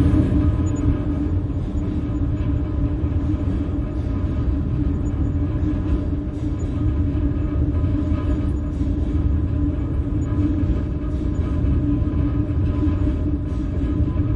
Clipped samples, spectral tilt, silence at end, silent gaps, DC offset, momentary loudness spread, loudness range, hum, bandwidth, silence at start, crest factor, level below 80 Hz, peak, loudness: under 0.1%; -9.5 dB/octave; 0 s; none; under 0.1%; 4 LU; 1 LU; none; 7.4 kHz; 0 s; 16 dB; -26 dBFS; -4 dBFS; -22 LUFS